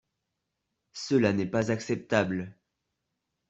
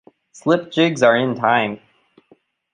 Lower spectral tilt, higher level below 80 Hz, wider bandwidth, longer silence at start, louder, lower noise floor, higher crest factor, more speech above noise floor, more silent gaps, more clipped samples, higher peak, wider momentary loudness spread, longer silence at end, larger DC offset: about the same, -6 dB/octave vs -5.5 dB/octave; about the same, -66 dBFS vs -66 dBFS; second, 8.2 kHz vs 10 kHz; first, 0.95 s vs 0.35 s; second, -28 LUFS vs -18 LUFS; first, -83 dBFS vs -56 dBFS; about the same, 22 dB vs 18 dB; first, 56 dB vs 39 dB; neither; neither; second, -8 dBFS vs -2 dBFS; first, 16 LU vs 11 LU; about the same, 1 s vs 0.95 s; neither